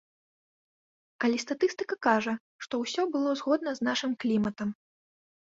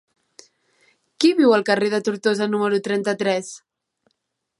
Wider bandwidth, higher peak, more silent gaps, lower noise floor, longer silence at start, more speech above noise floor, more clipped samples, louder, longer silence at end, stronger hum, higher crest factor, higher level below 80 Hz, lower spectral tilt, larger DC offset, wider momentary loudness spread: second, 7.8 kHz vs 11.5 kHz; second, -8 dBFS vs -4 dBFS; first, 2.40-2.59 s vs none; first, under -90 dBFS vs -75 dBFS; about the same, 1.2 s vs 1.2 s; first, over 61 dB vs 56 dB; neither; second, -29 LUFS vs -20 LUFS; second, 0.7 s vs 1 s; neither; about the same, 22 dB vs 18 dB; about the same, -70 dBFS vs -74 dBFS; about the same, -4.5 dB/octave vs -4.5 dB/octave; neither; about the same, 9 LU vs 8 LU